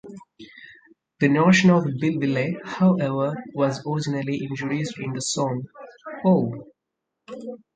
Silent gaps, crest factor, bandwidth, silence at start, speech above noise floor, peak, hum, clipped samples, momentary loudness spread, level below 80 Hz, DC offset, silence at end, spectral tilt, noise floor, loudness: none; 20 dB; 9.2 kHz; 0.05 s; 60 dB; -4 dBFS; none; under 0.1%; 23 LU; -62 dBFS; under 0.1%; 0.2 s; -6 dB/octave; -82 dBFS; -22 LUFS